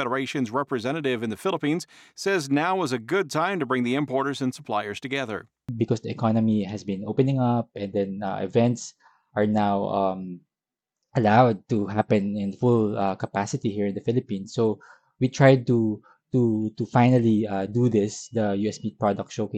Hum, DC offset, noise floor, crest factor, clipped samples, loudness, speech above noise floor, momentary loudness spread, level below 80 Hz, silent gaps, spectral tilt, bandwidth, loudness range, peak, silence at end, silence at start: none; under 0.1%; -89 dBFS; 20 dB; under 0.1%; -25 LUFS; 65 dB; 10 LU; -62 dBFS; none; -6.5 dB/octave; 12.5 kHz; 4 LU; -4 dBFS; 0 s; 0 s